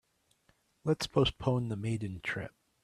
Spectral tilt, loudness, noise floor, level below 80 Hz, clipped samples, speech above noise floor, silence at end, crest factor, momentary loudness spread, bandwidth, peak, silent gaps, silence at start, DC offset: -6 dB/octave; -33 LUFS; -72 dBFS; -54 dBFS; under 0.1%; 40 dB; 0.35 s; 20 dB; 10 LU; 13.5 kHz; -14 dBFS; none; 0.85 s; under 0.1%